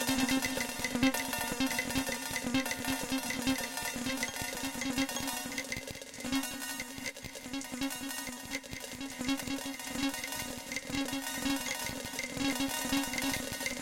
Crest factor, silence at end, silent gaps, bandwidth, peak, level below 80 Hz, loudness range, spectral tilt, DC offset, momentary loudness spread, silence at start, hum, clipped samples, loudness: 18 dB; 0 s; none; 17 kHz; -16 dBFS; -56 dBFS; 5 LU; -2.5 dB/octave; under 0.1%; 8 LU; 0 s; none; under 0.1%; -34 LUFS